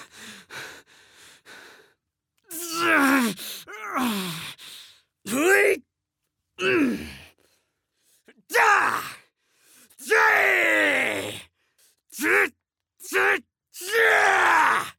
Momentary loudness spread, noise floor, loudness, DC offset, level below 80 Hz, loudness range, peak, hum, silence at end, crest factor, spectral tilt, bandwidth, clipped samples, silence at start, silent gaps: 22 LU; -82 dBFS; -21 LUFS; under 0.1%; -66 dBFS; 5 LU; -6 dBFS; none; 0.1 s; 18 dB; -2.5 dB/octave; 19.5 kHz; under 0.1%; 0 s; none